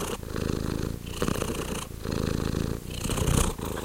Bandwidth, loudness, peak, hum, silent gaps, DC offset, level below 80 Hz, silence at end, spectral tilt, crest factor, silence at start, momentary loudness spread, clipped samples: 17 kHz; -30 LUFS; -8 dBFS; none; none; under 0.1%; -36 dBFS; 0 s; -5 dB/octave; 22 dB; 0 s; 7 LU; under 0.1%